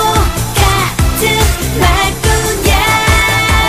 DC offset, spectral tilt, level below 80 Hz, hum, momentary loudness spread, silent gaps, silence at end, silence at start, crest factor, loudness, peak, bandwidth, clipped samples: under 0.1%; -3.5 dB/octave; -16 dBFS; none; 4 LU; none; 0 s; 0 s; 10 dB; -11 LUFS; 0 dBFS; 15.5 kHz; under 0.1%